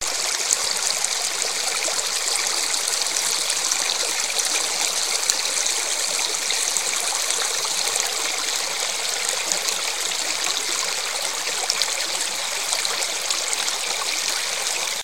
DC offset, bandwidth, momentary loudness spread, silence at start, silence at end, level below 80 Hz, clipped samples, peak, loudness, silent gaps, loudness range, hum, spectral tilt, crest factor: 0.7%; 17 kHz; 3 LU; 0 s; 0 s; -64 dBFS; under 0.1%; 0 dBFS; -21 LUFS; none; 2 LU; none; 2.5 dB/octave; 24 dB